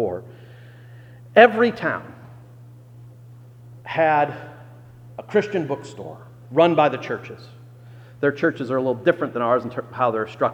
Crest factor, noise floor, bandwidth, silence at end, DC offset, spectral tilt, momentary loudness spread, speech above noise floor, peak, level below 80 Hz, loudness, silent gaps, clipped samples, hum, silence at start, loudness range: 22 dB; -44 dBFS; 8.6 kHz; 0 s; under 0.1%; -7 dB/octave; 24 LU; 24 dB; 0 dBFS; -64 dBFS; -21 LUFS; none; under 0.1%; none; 0 s; 4 LU